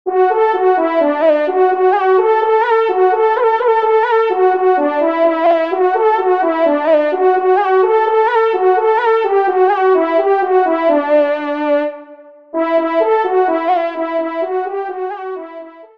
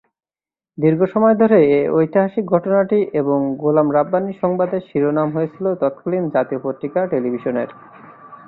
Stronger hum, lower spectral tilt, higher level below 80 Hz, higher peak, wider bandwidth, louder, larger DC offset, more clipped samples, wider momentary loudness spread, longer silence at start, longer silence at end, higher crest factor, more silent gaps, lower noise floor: neither; second, -5 dB/octave vs -12 dB/octave; second, -68 dBFS vs -60 dBFS; about the same, -2 dBFS vs -2 dBFS; first, 5.6 kHz vs 4.2 kHz; first, -14 LUFS vs -18 LUFS; first, 0.3% vs under 0.1%; neither; about the same, 7 LU vs 8 LU; second, 0.05 s vs 0.8 s; about the same, 0.1 s vs 0.15 s; about the same, 12 dB vs 16 dB; neither; second, -39 dBFS vs under -90 dBFS